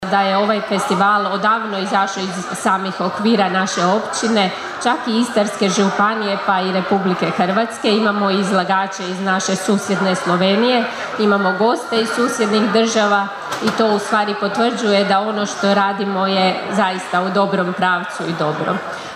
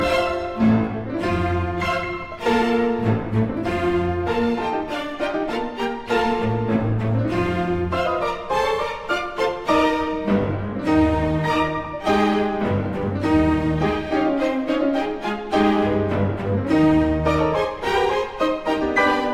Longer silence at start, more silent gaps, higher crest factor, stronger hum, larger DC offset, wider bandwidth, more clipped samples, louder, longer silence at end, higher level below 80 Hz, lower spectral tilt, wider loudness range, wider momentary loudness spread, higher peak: about the same, 0 s vs 0 s; neither; about the same, 14 dB vs 14 dB; neither; neither; about the same, 14 kHz vs 13.5 kHz; neither; first, -17 LUFS vs -21 LUFS; about the same, 0 s vs 0 s; second, -64 dBFS vs -38 dBFS; second, -4.5 dB/octave vs -7 dB/octave; about the same, 1 LU vs 3 LU; about the same, 5 LU vs 6 LU; first, -2 dBFS vs -6 dBFS